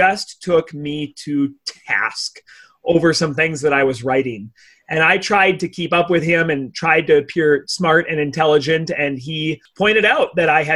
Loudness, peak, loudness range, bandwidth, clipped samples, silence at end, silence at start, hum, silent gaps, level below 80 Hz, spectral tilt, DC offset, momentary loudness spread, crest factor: -17 LUFS; -2 dBFS; 3 LU; 12 kHz; under 0.1%; 0 s; 0 s; none; none; -54 dBFS; -4.5 dB/octave; under 0.1%; 11 LU; 16 dB